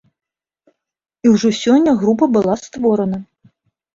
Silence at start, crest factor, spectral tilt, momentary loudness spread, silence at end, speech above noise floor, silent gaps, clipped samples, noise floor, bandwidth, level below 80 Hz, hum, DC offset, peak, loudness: 1.25 s; 16 dB; -6 dB/octave; 7 LU; 0.75 s; 47 dB; none; under 0.1%; -61 dBFS; 7.8 kHz; -54 dBFS; none; under 0.1%; -2 dBFS; -15 LUFS